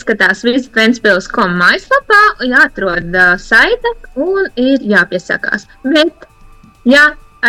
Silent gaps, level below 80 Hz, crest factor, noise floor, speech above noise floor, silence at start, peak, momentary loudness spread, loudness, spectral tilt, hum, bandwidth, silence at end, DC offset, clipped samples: none; -38 dBFS; 12 dB; -40 dBFS; 29 dB; 0.05 s; 0 dBFS; 9 LU; -11 LUFS; -4.5 dB/octave; none; 16 kHz; 0 s; under 0.1%; under 0.1%